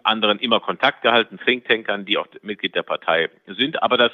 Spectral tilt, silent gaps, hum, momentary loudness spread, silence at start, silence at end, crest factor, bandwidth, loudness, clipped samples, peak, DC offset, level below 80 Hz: -6 dB/octave; none; none; 7 LU; 0.05 s; 0 s; 20 dB; 6.4 kHz; -20 LUFS; under 0.1%; 0 dBFS; under 0.1%; -74 dBFS